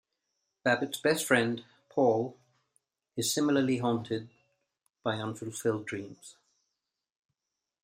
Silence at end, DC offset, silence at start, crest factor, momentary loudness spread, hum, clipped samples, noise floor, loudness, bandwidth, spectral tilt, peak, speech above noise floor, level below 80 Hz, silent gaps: 1.5 s; under 0.1%; 0.65 s; 24 dB; 13 LU; none; under 0.1%; -88 dBFS; -30 LUFS; 15.5 kHz; -4.5 dB/octave; -10 dBFS; 58 dB; -74 dBFS; none